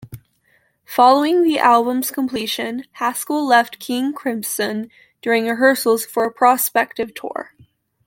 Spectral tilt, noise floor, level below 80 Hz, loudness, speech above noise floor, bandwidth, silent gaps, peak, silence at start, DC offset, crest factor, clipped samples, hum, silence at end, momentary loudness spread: -3 dB/octave; -61 dBFS; -64 dBFS; -18 LUFS; 43 dB; 17 kHz; none; -2 dBFS; 0 s; under 0.1%; 18 dB; under 0.1%; none; 0.65 s; 13 LU